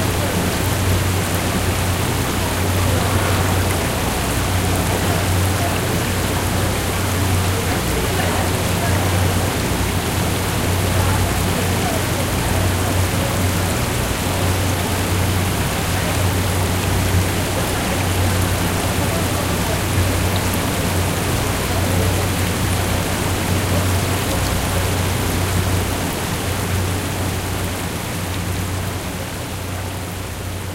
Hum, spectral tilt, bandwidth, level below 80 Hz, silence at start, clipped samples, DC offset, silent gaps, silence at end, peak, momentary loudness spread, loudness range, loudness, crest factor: none; -4.5 dB/octave; 17 kHz; -30 dBFS; 0 s; under 0.1%; under 0.1%; none; 0 s; -4 dBFS; 4 LU; 2 LU; -19 LUFS; 14 dB